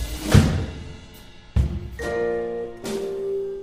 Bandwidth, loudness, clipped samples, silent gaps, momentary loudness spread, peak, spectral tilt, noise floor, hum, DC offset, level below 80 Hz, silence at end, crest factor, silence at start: 15.5 kHz; -24 LUFS; under 0.1%; none; 20 LU; -2 dBFS; -6.5 dB/octave; -44 dBFS; none; under 0.1%; -32 dBFS; 0 s; 22 dB; 0 s